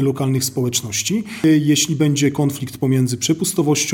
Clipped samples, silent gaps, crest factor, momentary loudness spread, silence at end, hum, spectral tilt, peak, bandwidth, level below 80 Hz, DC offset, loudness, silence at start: under 0.1%; none; 14 dB; 5 LU; 0 s; none; -4.5 dB/octave; -4 dBFS; 18 kHz; -56 dBFS; under 0.1%; -18 LUFS; 0 s